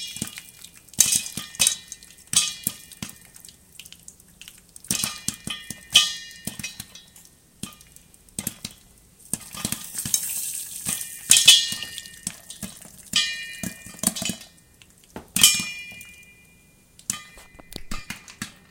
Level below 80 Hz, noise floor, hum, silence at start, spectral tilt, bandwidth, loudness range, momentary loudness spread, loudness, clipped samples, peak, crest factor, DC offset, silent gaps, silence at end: -52 dBFS; -55 dBFS; none; 0 s; 0.5 dB/octave; 17 kHz; 12 LU; 24 LU; -22 LUFS; under 0.1%; 0 dBFS; 28 dB; under 0.1%; none; 0.2 s